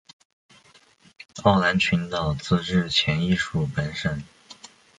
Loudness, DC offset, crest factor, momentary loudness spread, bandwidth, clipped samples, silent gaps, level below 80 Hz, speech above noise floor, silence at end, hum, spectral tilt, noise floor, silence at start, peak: -23 LUFS; under 0.1%; 22 dB; 23 LU; 10 kHz; under 0.1%; none; -46 dBFS; 33 dB; 0.45 s; none; -5.5 dB/octave; -56 dBFS; 1.35 s; -4 dBFS